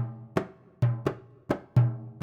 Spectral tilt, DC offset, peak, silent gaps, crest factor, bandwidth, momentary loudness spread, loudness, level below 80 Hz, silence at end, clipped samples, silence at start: -9 dB/octave; under 0.1%; -10 dBFS; none; 18 dB; 7 kHz; 11 LU; -29 LUFS; -56 dBFS; 0.05 s; under 0.1%; 0 s